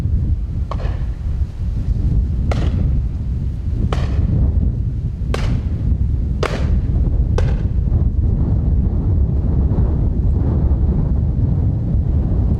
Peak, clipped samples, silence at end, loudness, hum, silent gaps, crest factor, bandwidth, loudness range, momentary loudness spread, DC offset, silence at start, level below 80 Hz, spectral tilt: -2 dBFS; under 0.1%; 0 s; -19 LUFS; none; none; 14 dB; 7 kHz; 3 LU; 5 LU; under 0.1%; 0 s; -18 dBFS; -9 dB/octave